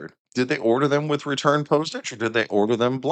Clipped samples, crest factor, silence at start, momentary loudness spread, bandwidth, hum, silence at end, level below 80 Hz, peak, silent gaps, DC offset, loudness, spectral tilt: under 0.1%; 18 dB; 0 s; 7 LU; 9 kHz; none; 0 s; -70 dBFS; -4 dBFS; 0.19-0.25 s; under 0.1%; -22 LUFS; -5.5 dB/octave